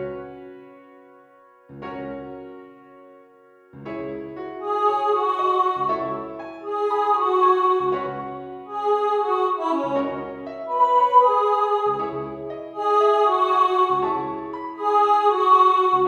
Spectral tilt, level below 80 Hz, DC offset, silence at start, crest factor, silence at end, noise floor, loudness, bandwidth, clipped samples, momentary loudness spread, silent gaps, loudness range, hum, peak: -6 dB/octave; -62 dBFS; under 0.1%; 0 s; 18 dB; 0 s; -52 dBFS; -20 LUFS; 9.2 kHz; under 0.1%; 18 LU; none; 17 LU; none; -4 dBFS